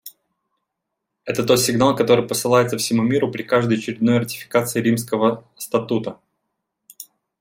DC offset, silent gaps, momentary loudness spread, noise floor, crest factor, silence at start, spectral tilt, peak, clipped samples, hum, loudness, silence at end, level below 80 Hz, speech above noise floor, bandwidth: under 0.1%; none; 15 LU; -80 dBFS; 18 dB; 0.05 s; -5 dB/octave; -2 dBFS; under 0.1%; none; -19 LUFS; 0.4 s; -60 dBFS; 61 dB; 16.5 kHz